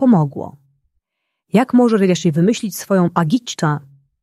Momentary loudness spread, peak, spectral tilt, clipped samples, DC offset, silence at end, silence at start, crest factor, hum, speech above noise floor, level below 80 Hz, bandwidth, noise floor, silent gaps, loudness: 9 LU; -2 dBFS; -6.5 dB/octave; under 0.1%; under 0.1%; 0.45 s; 0 s; 14 dB; none; 62 dB; -60 dBFS; 13.5 kHz; -77 dBFS; none; -16 LUFS